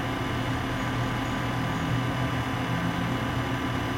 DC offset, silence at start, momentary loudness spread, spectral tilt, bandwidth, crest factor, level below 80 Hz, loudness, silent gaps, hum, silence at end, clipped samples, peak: under 0.1%; 0 s; 1 LU; -6 dB/octave; 16.5 kHz; 12 dB; -42 dBFS; -28 LUFS; none; none; 0 s; under 0.1%; -16 dBFS